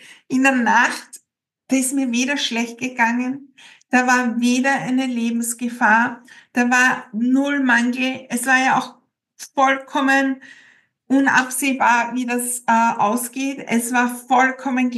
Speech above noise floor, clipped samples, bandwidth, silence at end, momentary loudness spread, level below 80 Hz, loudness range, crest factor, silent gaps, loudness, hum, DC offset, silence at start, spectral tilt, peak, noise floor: 52 dB; under 0.1%; 12.5 kHz; 0 s; 8 LU; -86 dBFS; 2 LU; 18 dB; none; -18 LUFS; none; under 0.1%; 0.1 s; -2.5 dB/octave; -2 dBFS; -70 dBFS